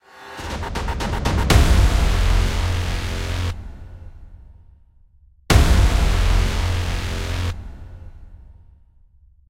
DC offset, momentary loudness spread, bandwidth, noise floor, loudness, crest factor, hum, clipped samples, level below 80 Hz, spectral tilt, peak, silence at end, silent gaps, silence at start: under 0.1%; 23 LU; 16 kHz; -52 dBFS; -21 LUFS; 18 dB; none; under 0.1%; -22 dBFS; -5 dB/octave; -2 dBFS; 1 s; none; 0.15 s